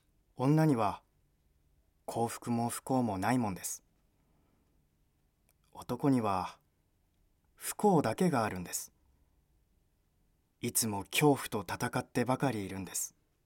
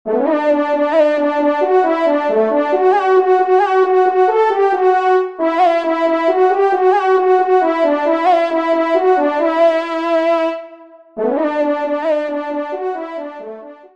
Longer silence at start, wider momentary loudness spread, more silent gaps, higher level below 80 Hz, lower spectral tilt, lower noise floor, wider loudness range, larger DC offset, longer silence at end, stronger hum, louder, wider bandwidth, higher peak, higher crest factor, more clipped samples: first, 0.4 s vs 0.05 s; first, 13 LU vs 9 LU; neither; about the same, -68 dBFS vs -68 dBFS; about the same, -5 dB/octave vs -5 dB/octave; first, -74 dBFS vs -40 dBFS; about the same, 5 LU vs 5 LU; second, under 0.1% vs 0.3%; first, 0.35 s vs 0.2 s; neither; second, -33 LUFS vs -14 LUFS; first, 17 kHz vs 7.4 kHz; second, -14 dBFS vs -2 dBFS; first, 20 dB vs 12 dB; neither